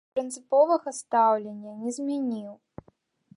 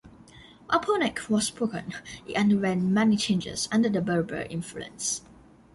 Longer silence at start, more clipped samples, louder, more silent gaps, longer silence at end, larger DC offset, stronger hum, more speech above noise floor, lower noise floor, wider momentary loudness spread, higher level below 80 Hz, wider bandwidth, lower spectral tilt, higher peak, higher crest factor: about the same, 0.15 s vs 0.05 s; neither; about the same, -26 LUFS vs -26 LUFS; neither; first, 0.8 s vs 0.55 s; neither; neither; first, 38 dB vs 25 dB; first, -64 dBFS vs -51 dBFS; first, 14 LU vs 11 LU; second, -70 dBFS vs -58 dBFS; about the same, 11.5 kHz vs 11.5 kHz; about the same, -5 dB/octave vs -4.5 dB/octave; about the same, -10 dBFS vs -12 dBFS; about the same, 18 dB vs 16 dB